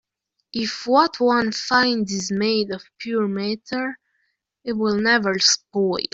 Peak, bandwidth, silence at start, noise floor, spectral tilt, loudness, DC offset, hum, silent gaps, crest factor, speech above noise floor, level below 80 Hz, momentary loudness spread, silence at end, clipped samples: -4 dBFS; 8 kHz; 0.55 s; -77 dBFS; -3 dB/octave; -20 LUFS; under 0.1%; none; none; 18 dB; 56 dB; -62 dBFS; 11 LU; 0.05 s; under 0.1%